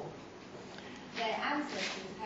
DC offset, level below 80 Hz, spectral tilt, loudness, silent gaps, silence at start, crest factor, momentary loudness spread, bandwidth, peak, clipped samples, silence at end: under 0.1%; -72 dBFS; -1.5 dB/octave; -38 LUFS; none; 0 s; 18 dB; 15 LU; 8 kHz; -22 dBFS; under 0.1%; 0 s